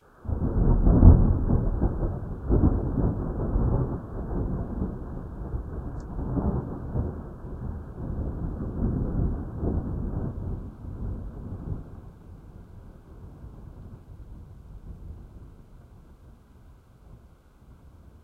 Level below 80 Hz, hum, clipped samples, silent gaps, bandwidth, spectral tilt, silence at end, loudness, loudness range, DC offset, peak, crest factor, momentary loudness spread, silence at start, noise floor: -30 dBFS; none; under 0.1%; none; 1.8 kHz; -12 dB/octave; 0.15 s; -28 LUFS; 24 LU; under 0.1%; 0 dBFS; 26 dB; 23 LU; 0.25 s; -53 dBFS